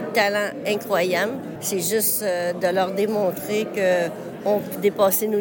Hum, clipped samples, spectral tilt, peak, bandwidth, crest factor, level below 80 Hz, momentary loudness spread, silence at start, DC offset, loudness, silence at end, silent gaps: none; under 0.1%; -3.5 dB/octave; -6 dBFS; 17 kHz; 16 dB; -66 dBFS; 6 LU; 0 s; under 0.1%; -22 LUFS; 0 s; none